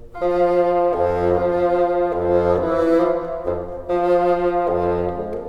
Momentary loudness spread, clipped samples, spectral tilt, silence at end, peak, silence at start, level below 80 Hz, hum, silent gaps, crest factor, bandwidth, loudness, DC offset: 7 LU; under 0.1%; -8.5 dB/octave; 0 s; -4 dBFS; 0 s; -40 dBFS; none; none; 14 dB; 6.2 kHz; -19 LUFS; under 0.1%